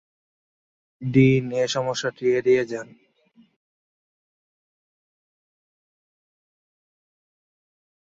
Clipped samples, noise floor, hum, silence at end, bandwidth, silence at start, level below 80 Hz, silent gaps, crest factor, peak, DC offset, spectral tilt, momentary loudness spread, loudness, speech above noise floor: under 0.1%; -59 dBFS; none; 5.25 s; 7.8 kHz; 1 s; -60 dBFS; none; 22 dB; -4 dBFS; under 0.1%; -6 dB/octave; 13 LU; -21 LUFS; 38 dB